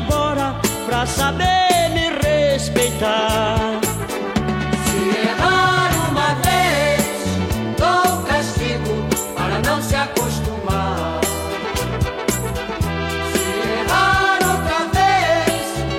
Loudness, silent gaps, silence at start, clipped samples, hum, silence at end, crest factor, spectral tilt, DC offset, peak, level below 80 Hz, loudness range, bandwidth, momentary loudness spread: -18 LUFS; none; 0 s; under 0.1%; none; 0 s; 18 dB; -4 dB/octave; under 0.1%; 0 dBFS; -32 dBFS; 4 LU; 16.5 kHz; 7 LU